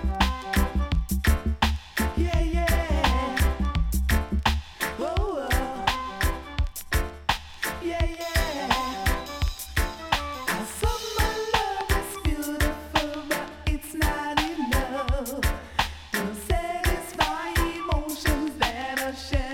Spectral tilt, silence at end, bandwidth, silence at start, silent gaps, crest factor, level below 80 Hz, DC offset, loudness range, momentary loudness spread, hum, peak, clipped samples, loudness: -4.5 dB/octave; 0 s; 18 kHz; 0 s; none; 18 dB; -30 dBFS; under 0.1%; 3 LU; 5 LU; none; -8 dBFS; under 0.1%; -27 LUFS